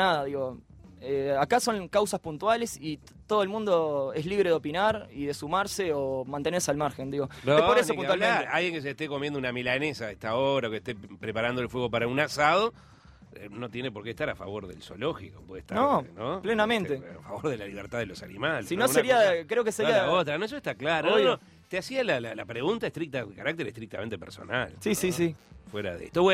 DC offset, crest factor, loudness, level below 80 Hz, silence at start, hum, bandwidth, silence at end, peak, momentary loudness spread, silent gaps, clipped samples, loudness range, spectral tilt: under 0.1%; 20 dB; -28 LUFS; -58 dBFS; 0 s; none; 16 kHz; 0 s; -8 dBFS; 13 LU; none; under 0.1%; 6 LU; -4.5 dB/octave